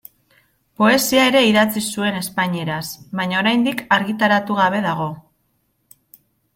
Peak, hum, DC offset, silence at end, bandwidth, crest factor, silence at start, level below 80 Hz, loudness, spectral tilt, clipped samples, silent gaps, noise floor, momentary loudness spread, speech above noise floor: -2 dBFS; none; under 0.1%; 1.35 s; 16.5 kHz; 18 dB; 0.8 s; -58 dBFS; -18 LUFS; -4 dB/octave; under 0.1%; none; -66 dBFS; 11 LU; 49 dB